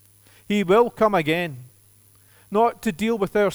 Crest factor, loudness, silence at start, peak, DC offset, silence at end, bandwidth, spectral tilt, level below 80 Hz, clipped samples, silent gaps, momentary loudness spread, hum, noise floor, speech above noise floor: 18 dB; -21 LUFS; 0.5 s; -6 dBFS; under 0.1%; 0 s; over 20 kHz; -6 dB/octave; -56 dBFS; under 0.1%; none; 8 LU; none; -55 dBFS; 34 dB